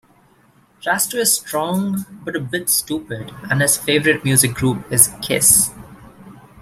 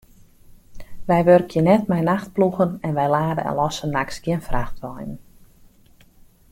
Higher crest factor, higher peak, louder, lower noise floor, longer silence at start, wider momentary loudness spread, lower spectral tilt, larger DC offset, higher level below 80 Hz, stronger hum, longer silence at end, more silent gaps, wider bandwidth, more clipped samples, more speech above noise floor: about the same, 20 dB vs 20 dB; about the same, 0 dBFS vs -2 dBFS; first, -16 LUFS vs -20 LUFS; about the same, -54 dBFS vs -52 dBFS; first, 0.85 s vs 0.7 s; second, 14 LU vs 17 LU; second, -3 dB/octave vs -7 dB/octave; neither; second, -50 dBFS vs -40 dBFS; neither; second, 0.2 s vs 1.3 s; neither; about the same, 16 kHz vs 16.5 kHz; neither; first, 36 dB vs 32 dB